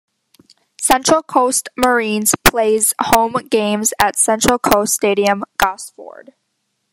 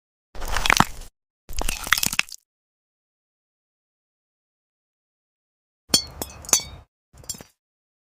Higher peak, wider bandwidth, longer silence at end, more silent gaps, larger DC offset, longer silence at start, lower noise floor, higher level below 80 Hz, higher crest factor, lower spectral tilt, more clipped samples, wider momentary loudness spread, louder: about the same, 0 dBFS vs 0 dBFS; about the same, 16 kHz vs 16 kHz; first, 0.85 s vs 0.7 s; second, none vs 1.30-1.48 s, 2.45-5.88 s, 6.88-7.12 s; neither; first, 0.8 s vs 0.35 s; second, -70 dBFS vs under -90 dBFS; about the same, -40 dBFS vs -38 dBFS; second, 16 dB vs 28 dB; first, -2.5 dB/octave vs -1 dB/octave; neither; second, 5 LU vs 20 LU; first, -15 LUFS vs -22 LUFS